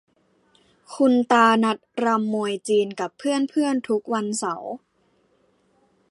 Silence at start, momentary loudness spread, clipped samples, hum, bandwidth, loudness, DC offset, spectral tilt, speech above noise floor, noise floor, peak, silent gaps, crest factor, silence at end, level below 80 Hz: 0.9 s; 12 LU; under 0.1%; none; 11.5 kHz; -22 LUFS; under 0.1%; -4.5 dB/octave; 43 dB; -64 dBFS; -4 dBFS; none; 20 dB; 1.35 s; -76 dBFS